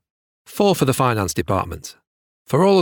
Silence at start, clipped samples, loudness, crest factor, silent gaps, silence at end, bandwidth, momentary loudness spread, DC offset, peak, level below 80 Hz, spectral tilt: 0.5 s; under 0.1%; -19 LUFS; 16 dB; 2.07-2.45 s; 0 s; 20 kHz; 18 LU; under 0.1%; -4 dBFS; -50 dBFS; -5.5 dB/octave